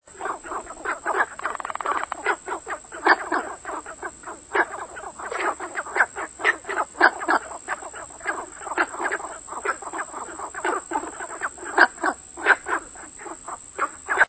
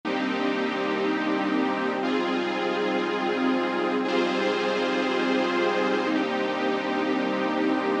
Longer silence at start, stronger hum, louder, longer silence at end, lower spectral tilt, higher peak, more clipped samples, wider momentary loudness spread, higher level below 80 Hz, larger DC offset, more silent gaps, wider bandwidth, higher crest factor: about the same, 0.05 s vs 0.05 s; neither; about the same, -25 LUFS vs -25 LUFS; about the same, 0 s vs 0 s; second, -1.5 dB/octave vs -5 dB/octave; first, 0 dBFS vs -12 dBFS; neither; first, 15 LU vs 2 LU; first, -58 dBFS vs -88 dBFS; neither; neither; second, 8 kHz vs 9.2 kHz; first, 26 dB vs 14 dB